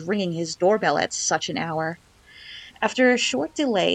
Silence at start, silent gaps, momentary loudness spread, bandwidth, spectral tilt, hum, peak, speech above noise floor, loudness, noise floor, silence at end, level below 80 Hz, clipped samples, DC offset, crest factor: 0 s; none; 18 LU; 9.8 kHz; -3.5 dB/octave; none; -6 dBFS; 22 dB; -23 LUFS; -44 dBFS; 0 s; -62 dBFS; under 0.1%; under 0.1%; 18 dB